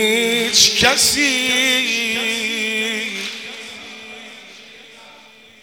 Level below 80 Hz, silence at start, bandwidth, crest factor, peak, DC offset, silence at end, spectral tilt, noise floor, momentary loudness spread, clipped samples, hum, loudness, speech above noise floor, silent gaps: -54 dBFS; 0 s; 18 kHz; 20 dB; 0 dBFS; under 0.1%; 0.5 s; -0.5 dB/octave; -45 dBFS; 22 LU; under 0.1%; none; -15 LUFS; 29 dB; none